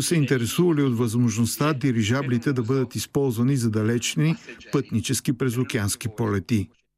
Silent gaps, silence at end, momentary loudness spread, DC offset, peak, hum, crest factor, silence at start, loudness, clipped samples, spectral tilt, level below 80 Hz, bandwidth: none; 0.3 s; 5 LU; under 0.1%; -8 dBFS; none; 14 dB; 0 s; -24 LUFS; under 0.1%; -5.5 dB/octave; -60 dBFS; 15.5 kHz